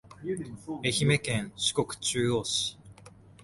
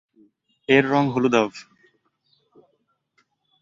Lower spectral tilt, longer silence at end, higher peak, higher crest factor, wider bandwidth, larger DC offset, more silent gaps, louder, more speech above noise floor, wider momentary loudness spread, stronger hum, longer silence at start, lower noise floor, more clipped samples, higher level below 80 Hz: second, -3.5 dB/octave vs -6 dB/octave; second, 0.1 s vs 2 s; second, -12 dBFS vs -2 dBFS; about the same, 18 dB vs 22 dB; first, 11.5 kHz vs 7.6 kHz; neither; neither; second, -29 LUFS vs -20 LUFS; second, 23 dB vs 51 dB; second, 10 LU vs 19 LU; neither; second, 0.05 s vs 0.7 s; second, -53 dBFS vs -70 dBFS; neither; first, -58 dBFS vs -64 dBFS